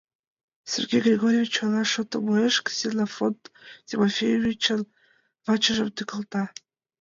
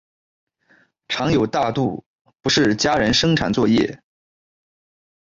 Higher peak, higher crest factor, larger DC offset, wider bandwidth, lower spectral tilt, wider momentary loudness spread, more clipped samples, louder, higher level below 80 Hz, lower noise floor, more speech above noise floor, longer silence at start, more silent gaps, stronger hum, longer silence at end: about the same, -8 dBFS vs -6 dBFS; about the same, 16 dB vs 16 dB; neither; about the same, 7.6 kHz vs 7.8 kHz; about the same, -4 dB/octave vs -4.5 dB/octave; about the same, 11 LU vs 10 LU; neither; second, -24 LUFS vs -19 LUFS; second, -64 dBFS vs -46 dBFS; first, -64 dBFS vs -58 dBFS; about the same, 40 dB vs 40 dB; second, 0.65 s vs 1.1 s; second, none vs 2.06-2.25 s; neither; second, 0.55 s vs 1.25 s